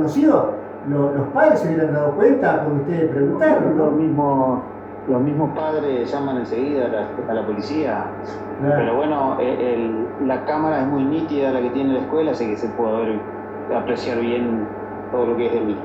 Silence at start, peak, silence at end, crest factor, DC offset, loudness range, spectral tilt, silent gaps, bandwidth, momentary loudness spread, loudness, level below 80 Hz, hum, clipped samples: 0 s; -2 dBFS; 0 s; 18 dB; under 0.1%; 5 LU; -8.5 dB/octave; none; 8 kHz; 9 LU; -20 LUFS; -56 dBFS; none; under 0.1%